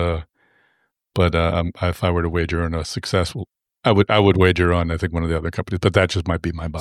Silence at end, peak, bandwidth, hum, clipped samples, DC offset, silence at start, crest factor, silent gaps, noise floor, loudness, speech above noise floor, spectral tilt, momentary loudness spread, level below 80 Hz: 0 s; 0 dBFS; 13 kHz; none; under 0.1%; under 0.1%; 0 s; 18 dB; none; -67 dBFS; -20 LUFS; 47 dB; -6.5 dB/octave; 10 LU; -34 dBFS